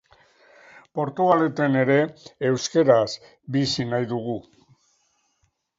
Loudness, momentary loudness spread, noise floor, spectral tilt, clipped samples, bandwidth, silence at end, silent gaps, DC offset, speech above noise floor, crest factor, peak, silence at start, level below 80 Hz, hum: -22 LUFS; 11 LU; -70 dBFS; -5.5 dB/octave; under 0.1%; 7.8 kHz; 1.35 s; none; under 0.1%; 48 dB; 20 dB; -4 dBFS; 0.95 s; -62 dBFS; none